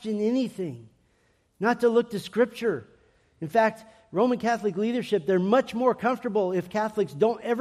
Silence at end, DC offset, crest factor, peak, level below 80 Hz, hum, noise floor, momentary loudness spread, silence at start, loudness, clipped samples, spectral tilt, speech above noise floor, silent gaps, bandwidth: 0 s; under 0.1%; 18 dB; -8 dBFS; -68 dBFS; none; -67 dBFS; 8 LU; 0 s; -26 LUFS; under 0.1%; -6.5 dB/octave; 41 dB; none; 14 kHz